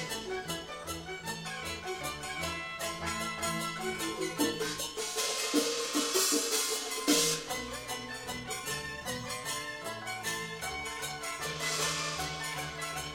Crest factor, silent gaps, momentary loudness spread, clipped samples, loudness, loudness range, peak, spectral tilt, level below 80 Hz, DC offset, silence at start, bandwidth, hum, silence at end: 20 dB; none; 10 LU; under 0.1%; -33 LUFS; 7 LU; -14 dBFS; -2 dB/octave; -58 dBFS; under 0.1%; 0 s; 17.5 kHz; none; 0 s